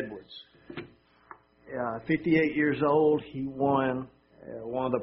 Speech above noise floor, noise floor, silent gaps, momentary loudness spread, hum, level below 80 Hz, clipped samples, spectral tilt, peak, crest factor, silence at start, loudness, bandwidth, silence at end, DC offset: 27 dB; -54 dBFS; none; 20 LU; none; -62 dBFS; under 0.1%; -5.5 dB/octave; -12 dBFS; 18 dB; 0 s; -28 LUFS; 5.8 kHz; 0 s; under 0.1%